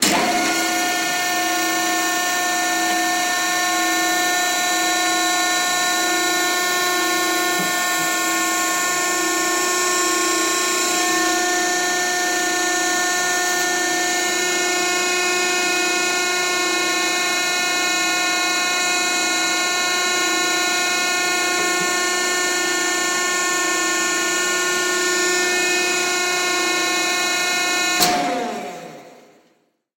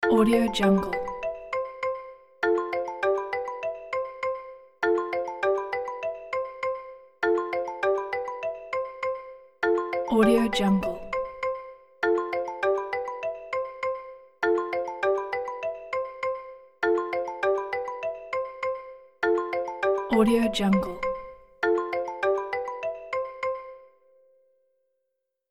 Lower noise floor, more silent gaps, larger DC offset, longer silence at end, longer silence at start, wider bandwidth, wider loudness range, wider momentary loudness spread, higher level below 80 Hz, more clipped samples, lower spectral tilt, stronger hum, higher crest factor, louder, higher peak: second, -62 dBFS vs -80 dBFS; neither; neither; second, 0.85 s vs 1.65 s; about the same, 0 s vs 0 s; about the same, 16.5 kHz vs 15 kHz; second, 1 LU vs 4 LU; second, 1 LU vs 11 LU; second, -62 dBFS vs -54 dBFS; neither; second, 0 dB/octave vs -6 dB/octave; neither; about the same, 18 dB vs 18 dB; first, -18 LUFS vs -28 LUFS; first, -2 dBFS vs -10 dBFS